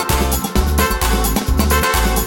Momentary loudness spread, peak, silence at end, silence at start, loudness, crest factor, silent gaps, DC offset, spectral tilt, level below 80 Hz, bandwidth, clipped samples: 3 LU; -2 dBFS; 0 s; 0 s; -16 LUFS; 14 dB; none; under 0.1%; -4 dB/octave; -18 dBFS; 19.5 kHz; under 0.1%